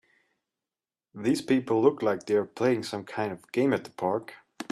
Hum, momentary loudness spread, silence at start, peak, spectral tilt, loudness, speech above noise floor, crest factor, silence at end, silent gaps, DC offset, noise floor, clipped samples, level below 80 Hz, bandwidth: none; 9 LU; 1.15 s; -8 dBFS; -6 dB/octave; -28 LUFS; over 63 dB; 20 dB; 0.05 s; none; under 0.1%; under -90 dBFS; under 0.1%; -72 dBFS; 13 kHz